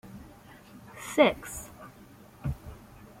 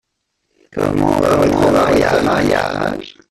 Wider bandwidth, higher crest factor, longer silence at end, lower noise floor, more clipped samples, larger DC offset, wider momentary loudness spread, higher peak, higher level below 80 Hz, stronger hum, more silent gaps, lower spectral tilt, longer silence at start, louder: first, 16.5 kHz vs 14.5 kHz; first, 26 dB vs 14 dB; about the same, 0.15 s vs 0.2 s; second, -53 dBFS vs -71 dBFS; neither; neither; first, 27 LU vs 9 LU; second, -8 dBFS vs 0 dBFS; second, -50 dBFS vs -38 dBFS; neither; neither; second, -4.5 dB/octave vs -6 dB/octave; second, 0.05 s vs 0.75 s; second, -29 LUFS vs -14 LUFS